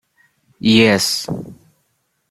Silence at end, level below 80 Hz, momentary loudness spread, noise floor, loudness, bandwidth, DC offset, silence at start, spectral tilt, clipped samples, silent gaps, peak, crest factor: 0.75 s; -54 dBFS; 17 LU; -67 dBFS; -15 LUFS; 16 kHz; under 0.1%; 0.65 s; -4 dB/octave; under 0.1%; none; 0 dBFS; 18 dB